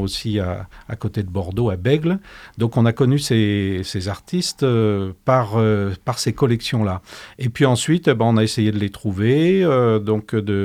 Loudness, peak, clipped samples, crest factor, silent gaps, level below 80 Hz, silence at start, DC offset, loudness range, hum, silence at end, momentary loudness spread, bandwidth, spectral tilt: -19 LUFS; -2 dBFS; under 0.1%; 16 dB; none; -48 dBFS; 0 s; under 0.1%; 2 LU; none; 0 s; 10 LU; 15 kHz; -6.5 dB/octave